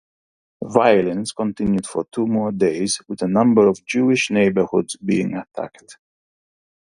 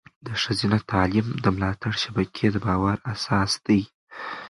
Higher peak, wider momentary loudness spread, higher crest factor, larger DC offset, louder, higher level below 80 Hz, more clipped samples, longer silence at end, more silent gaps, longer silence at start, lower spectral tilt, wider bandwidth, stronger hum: first, 0 dBFS vs -4 dBFS; first, 11 LU vs 6 LU; about the same, 20 dB vs 20 dB; neither; first, -19 LUFS vs -24 LUFS; second, -54 dBFS vs -44 dBFS; neither; first, 0.9 s vs 0 s; second, none vs 3.94-4.07 s; first, 0.6 s vs 0.25 s; about the same, -5.5 dB/octave vs -5.5 dB/octave; about the same, 11.5 kHz vs 11.5 kHz; neither